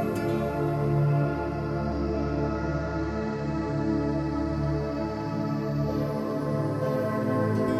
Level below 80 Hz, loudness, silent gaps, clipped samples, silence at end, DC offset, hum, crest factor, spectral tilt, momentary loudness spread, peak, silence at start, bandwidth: -40 dBFS; -28 LUFS; none; under 0.1%; 0 s; under 0.1%; none; 14 dB; -8.5 dB/octave; 5 LU; -12 dBFS; 0 s; 13.5 kHz